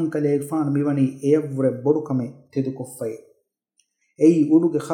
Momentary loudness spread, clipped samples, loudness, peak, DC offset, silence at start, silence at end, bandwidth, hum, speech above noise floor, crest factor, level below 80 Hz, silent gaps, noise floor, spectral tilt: 13 LU; under 0.1%; -21 LUFS; -4 dBFS; under 0.1%; 0 s; 0 s; 15 kHz; none; 49 dB; 18 dB; -78 dBFS; none; -69 dBFS; -8.5 dB/octave